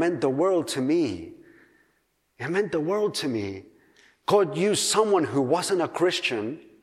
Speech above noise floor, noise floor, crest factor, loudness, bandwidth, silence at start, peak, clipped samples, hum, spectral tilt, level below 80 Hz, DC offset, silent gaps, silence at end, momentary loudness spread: 46 dB; -70 dBFS; 18 dB; -25 LUFS; 15 kHz; 0 s; -8 dBFS; under 0.1%; none; -4 dB/octave; -68 dBFS; under 0.1%; none; 0.2 s; 13 LU